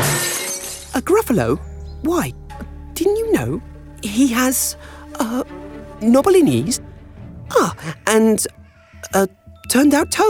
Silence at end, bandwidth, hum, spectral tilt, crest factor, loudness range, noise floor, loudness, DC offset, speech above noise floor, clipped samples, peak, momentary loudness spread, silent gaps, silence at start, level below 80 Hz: 0 s; 19 kHz; none; -4 dB/octave; 16 dB; 3 LU; -39 dBFS; -18 LUFS; under 0.1%; 23 dB; under 0.1%; -4 dBFS; 20 LU; none; 0 s; -40 dBFS